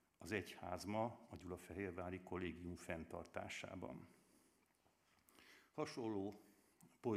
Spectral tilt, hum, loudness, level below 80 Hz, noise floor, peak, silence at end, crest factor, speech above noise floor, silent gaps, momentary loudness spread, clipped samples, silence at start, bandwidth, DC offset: -5.5 dB/octave; none; -49 LUFS; -78 dBFS; -79 dBFS; -26 dBFS; 0 s; 22 dB; 31 dB; none; 13 LU; under 0.1%; 0.2 s; 15.5 kHz; under 0.1%